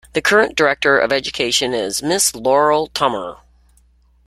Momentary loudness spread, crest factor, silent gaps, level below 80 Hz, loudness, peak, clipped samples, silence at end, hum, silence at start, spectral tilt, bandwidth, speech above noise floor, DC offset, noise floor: 6 LU; 16 dB; none; -50 dBFS; -16 LUFS; -2 dBFS; under 0.1%; 0.9 s; none; 0.15 s; -2 dB/octave; 15.5 kHz; 37 dB; under 0.1%; -54 dBFS